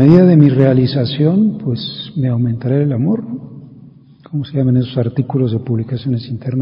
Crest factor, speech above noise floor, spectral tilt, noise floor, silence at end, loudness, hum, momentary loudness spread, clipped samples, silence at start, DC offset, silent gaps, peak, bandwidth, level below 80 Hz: 14 dB; 27 dB; -10.5 dB/octave; -41 dBFS; 0 s; -15 LUFS; none; 13 LU; 0.4%; 0 s; under 0.1%; none; 0 dBFS; 5.4 kHz; -48 dBFS